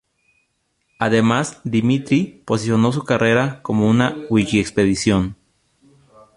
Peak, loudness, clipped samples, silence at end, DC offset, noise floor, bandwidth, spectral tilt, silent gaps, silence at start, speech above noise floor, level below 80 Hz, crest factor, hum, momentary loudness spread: 0 dBFS; -18 LUFS; under 0.1%; 1 s; under 0.1%; -68 dBFS; 11.5 kHz; -6 dB/octave; none; 1 s; 51 dB; -46 dBFS; 18 dB; none; 5 LU